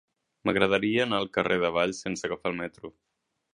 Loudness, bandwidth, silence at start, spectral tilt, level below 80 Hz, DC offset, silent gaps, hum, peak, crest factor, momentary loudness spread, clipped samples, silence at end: -27 LUFS; 10.5 kHz; 0.45 s; -4.5 dB/octave; -60 dBFS; under 0.1%; none; none; -4 dBFS; 24 dB; 12 LU; under 0.1%; 0.65 s